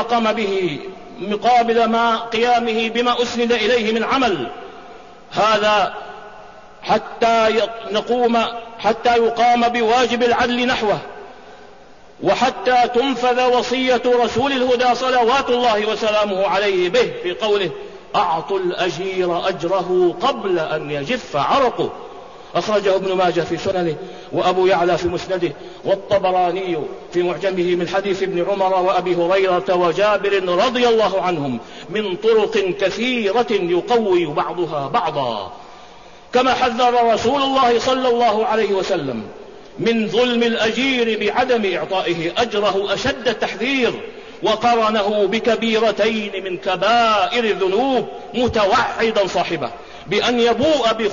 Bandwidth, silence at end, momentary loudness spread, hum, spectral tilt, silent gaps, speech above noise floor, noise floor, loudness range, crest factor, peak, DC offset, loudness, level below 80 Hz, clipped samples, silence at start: 7.4 kHz; 0 s; 9 LU; none; -4.5 dB/octave; none; 27 dB; -44 dBFS; 3 LU; 12 dB; -6 dBFS; 0.5%; -18 LUFS; -50 dBFS; under 0.1%; 0 s